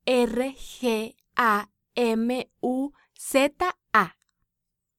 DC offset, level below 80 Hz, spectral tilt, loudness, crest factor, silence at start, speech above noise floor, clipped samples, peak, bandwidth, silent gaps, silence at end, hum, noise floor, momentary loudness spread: under 0.1%; -56 dBFS; -4 dB/octave; -26 LUFS; 20 dB; 0.05 s; 58 dB; under 0.1%; -6 dBFS; 16.5 kHz; none; 0.9 s; none; -83 dBFS; 9 LU